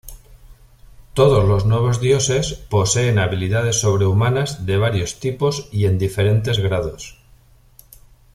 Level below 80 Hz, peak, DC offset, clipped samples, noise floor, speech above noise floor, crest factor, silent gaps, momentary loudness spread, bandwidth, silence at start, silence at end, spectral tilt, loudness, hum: -38 dBFS; -2 dBFS; under 0.1%; under 0.1%; -50 dBFS; 33 dB; 16 dB; none; 6 LU; 14.5 kHz; 0.05 s; 1.25 s; -5 dB/octave; -18 LUFS; none